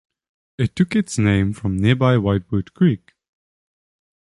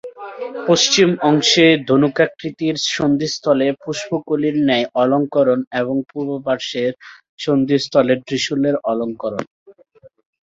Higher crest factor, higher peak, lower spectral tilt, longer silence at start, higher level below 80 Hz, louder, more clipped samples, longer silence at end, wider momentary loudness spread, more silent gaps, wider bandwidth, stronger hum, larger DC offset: about the same, 18 dB vs 16 dB; about the same, -2 dBFS vs -2 dBFS; first, -7 dB/octave vs -4 dB/octave; first, 0.6 s vs 0.05 s; first, -42 dBFS vs -58 dBFS; about the same, -19 LUFS vs -17 LUFS; neither; first, 1.4 s vs 0.75 s; second, 8 LU vs 12 LU; second, none vs 5.67-5.71 s, 7.29-7.38 s, 9.47-9.66 s; first, 11.5 kHz vs 7.8 kHz; neither; neither